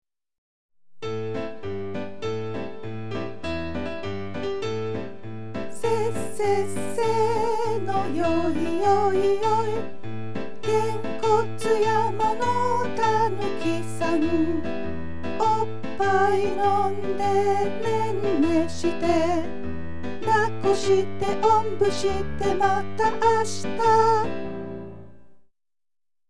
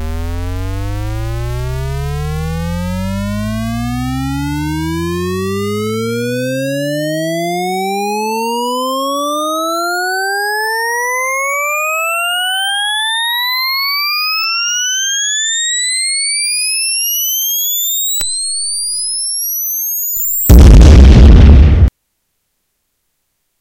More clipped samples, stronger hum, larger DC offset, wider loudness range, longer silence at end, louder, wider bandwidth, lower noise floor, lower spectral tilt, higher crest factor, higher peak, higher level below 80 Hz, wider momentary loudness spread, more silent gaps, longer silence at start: second, under 0.1% vs 2%; neither; first, 4% vs under 0.1%; second, 8 LU vs 11 LU; second, 0 s vs 1.7 s; second, -25 LUFS vs -13 LUFS; second, 13 kHz vs 17 kHz; first, -89 dBFS vs -67 dBFS; first, -5.5 dB/octave vs -3.5 dB/octave; about the same, 16 dB vs 12 dB; second, -8 dBFS vs 0 dBFS; second, -52 dBFS vs -16 dBFS; about the same, 12 LU vs 13 LU; first, 0.38-0.69 s vs none; about the same, 0 s vs 0 s